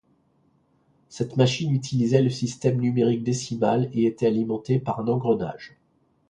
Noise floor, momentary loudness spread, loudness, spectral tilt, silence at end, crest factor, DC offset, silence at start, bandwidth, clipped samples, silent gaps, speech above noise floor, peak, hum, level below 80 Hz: -65 dBFS; 5 LU; -24 LUFS; -6.5 dB/octave; 0.6 s; 20 dB; under 0.1%; 1.1 s; 10 kHz; under 0.1%; none; 42 dB; -4 dBFS; none; -60 dBFS